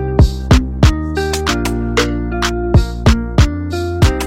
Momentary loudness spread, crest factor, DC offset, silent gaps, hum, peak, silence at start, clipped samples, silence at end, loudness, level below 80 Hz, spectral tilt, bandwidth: 5 LU; 14 dB; under 0.1%; none; none; 0 dBFS; 0 s; under 0.1%; 0 s; -15 LUFS; -18 dBFS; -6 dB/octave; 16 kHz